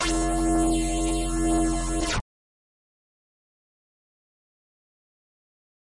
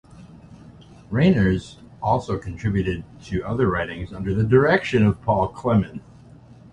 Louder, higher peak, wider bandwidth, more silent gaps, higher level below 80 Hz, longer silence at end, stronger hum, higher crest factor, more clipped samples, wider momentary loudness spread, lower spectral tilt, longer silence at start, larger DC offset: second, -25 LUFS vs -22 LUFS; second, -16 dBFS vs -4 dBFS; first, 11.5 kHz vs 10 kHz; neither; first, -34 dBFS vs -40 dBFS; first, 3.75 s vs 0.7 s; neither; second, 12 dB vs 18 dB; neither; second, 4 LU vs 12 LU; second, -4.5 dB/octave vs -8 dB/octave; second, 0 s vs 0.15 s; neither